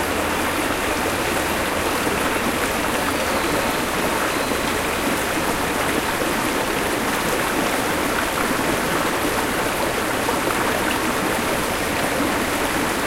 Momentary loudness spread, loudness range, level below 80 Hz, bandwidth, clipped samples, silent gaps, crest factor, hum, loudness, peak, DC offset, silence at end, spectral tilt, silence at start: 1 LU; 0 LU; -40 dBFS; 16 kHz; under 0.1%; none; 14 dB; none; -21 LUFS; -6 dBFS; under 0.1%; 0 s; -3 dB/octave; 0 s